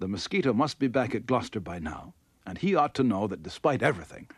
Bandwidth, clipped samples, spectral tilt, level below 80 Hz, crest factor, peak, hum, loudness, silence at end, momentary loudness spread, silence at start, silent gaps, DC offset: 12 kHz; under 0.1%; -6 dB/octave; -56 dBFS; 20 dB; -10 dBFS; none; -28 LUFS; 0.15 s; 12 LU; 0 s; none; under 0.1%